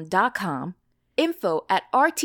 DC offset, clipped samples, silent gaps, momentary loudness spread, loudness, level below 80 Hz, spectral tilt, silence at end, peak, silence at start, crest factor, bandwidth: under 0.1%; under 0.1%; none; 10 LU; -24 LUFS; -68 dBFS; -4 dB/octave; 0 s; -8 dBFS; 0 s; 18 dB; 19 kHz